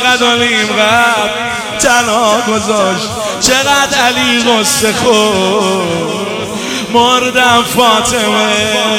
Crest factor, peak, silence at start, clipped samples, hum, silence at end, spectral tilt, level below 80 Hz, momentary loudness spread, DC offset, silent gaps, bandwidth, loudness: 10 dB; 0 dBFS; 0 s; 0.2%; none; 0 s; -2.5 dB/octave; -42 dBFS; 7 LU; under 0.1%; none; over 20 kHz; -10 LUFS